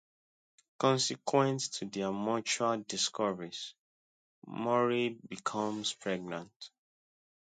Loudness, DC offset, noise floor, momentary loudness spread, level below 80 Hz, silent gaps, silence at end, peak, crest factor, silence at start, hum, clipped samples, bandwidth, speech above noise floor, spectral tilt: -33 LUFS; under 0.1%; under -90 dBFS; 13 LU; -78 dBFS; 3.79-4.42 s, 6.56-6.60 s; 0.9 s; -12 dBFS; 22 dB; 0.8 s; none; under 0.1%; 9.4 kHz; over 57 dB; -3.5 dB/octave